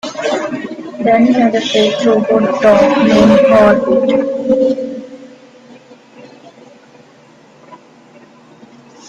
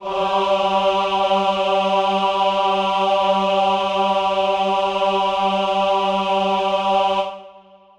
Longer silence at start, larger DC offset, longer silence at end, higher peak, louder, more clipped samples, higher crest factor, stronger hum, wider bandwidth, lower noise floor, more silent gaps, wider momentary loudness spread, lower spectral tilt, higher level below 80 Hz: about the same, 0.05 s vs 0 s; neither; first, 1.35 s vs 0.4 s; first, 0 dBFS vs -6 dBFS; first, -11 LUFS vs -18 LUFS; neither; about the same, 14 dB vs 12 dB; neither; second, 8.8 kHz vs 10 kHz; about the same, -43 dBFS vs -46 dBFS; neither; first, 14 LU vs 2 LU; about the same, -5.5 dB/octave vs -4.5 dB/octave; first, -48 dBFS vs -54 dBFS